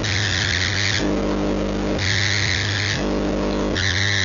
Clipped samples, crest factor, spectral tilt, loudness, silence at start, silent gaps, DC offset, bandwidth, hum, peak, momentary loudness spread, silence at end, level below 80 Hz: under 0.1%; 14 dB; -4 dB/octave; -20 LUFS; 0 s; none; under 0.1%; 7.6 kHz; none; -8 dBFS; 4 LU; 0 s; -34 dBFS